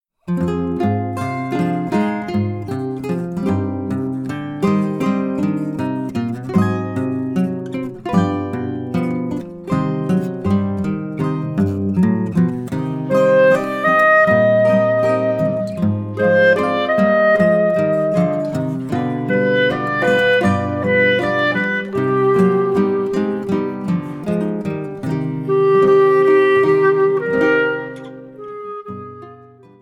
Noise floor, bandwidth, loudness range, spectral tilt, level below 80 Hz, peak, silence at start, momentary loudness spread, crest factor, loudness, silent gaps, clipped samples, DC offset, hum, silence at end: -43 dBFS; 12.5 kHz; 6 LU; -7.5 dB/octave; -52 dBFS; -2 dBFS; 0.25 s; 11 LU; 16 dB; -17 LUFS; none; under 0.1%; under 0.1%; none; 0.45 s